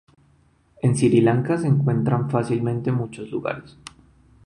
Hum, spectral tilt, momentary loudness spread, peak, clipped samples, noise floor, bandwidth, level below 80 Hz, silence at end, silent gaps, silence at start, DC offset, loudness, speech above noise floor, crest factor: none; -7.5 dB/octave; 12 LU; -6 dBFS; under 0.1%; -59 dBFS; 11 kHz; -56 dBFS; 0.85 s; none; 0.85 s; under 0.1%; -22 LUFS; 38 dB; 16 dB